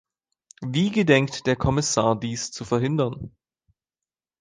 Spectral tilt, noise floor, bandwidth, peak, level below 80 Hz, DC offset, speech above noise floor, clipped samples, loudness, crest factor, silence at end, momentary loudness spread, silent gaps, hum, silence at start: -5 dB/octave; under -90 dBFS; 10.5 kHz; -4 dBFS; -46 dBFS; under 0.1%; over 67 dB; under 0.1%; -23 LUFS; 20 dB; 1.1 s; 12 LU; none; none; 0.6 s